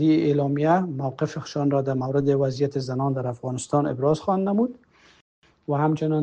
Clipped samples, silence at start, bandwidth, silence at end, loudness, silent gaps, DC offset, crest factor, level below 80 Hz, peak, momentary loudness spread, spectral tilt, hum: under 0.1%; 0 s; 9.2 kHz; 0 s; -24 LUFS; 5.21-5.42 s; under 0.1%; 16 dB; -62 dBFS; -8 dBFS; 7 LU; -7.5 dB/octave; none